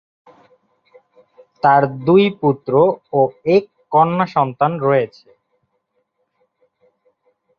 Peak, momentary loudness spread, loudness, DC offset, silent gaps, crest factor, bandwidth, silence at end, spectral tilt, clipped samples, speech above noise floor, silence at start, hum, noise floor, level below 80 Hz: -2 dBFS; 5 LU; -16 LUFS; under 0.1%; none; 18 dB; 6.4 kHz; 2.5 s; -9 dB/octave; under 0.1%; 54 dB; 1.65 s; none; -69 dBFS; -60 dBFS